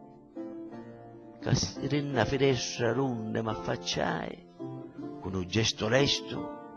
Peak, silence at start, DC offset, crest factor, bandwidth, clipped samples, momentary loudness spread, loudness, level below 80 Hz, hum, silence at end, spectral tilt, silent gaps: -10 dBFS; 0 s; under 0.1%; 20 dB; 11 kHz; under 0.1%; 17 LU; -30 LUFS; -54 dBFS; none; 0 s; -4.5 dB/octave; none